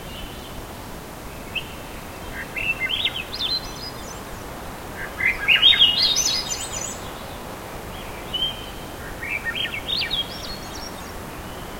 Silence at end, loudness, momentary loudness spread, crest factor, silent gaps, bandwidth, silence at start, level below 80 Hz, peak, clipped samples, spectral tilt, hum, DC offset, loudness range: 0 s; -21 LUFS; 19 LU; 22 dB; none; 16.5 kHz; 0 s; -42 dBFS; -2 dBFS; under 0.1%; -1 dB/octave; none; under 0.1%; 9 LU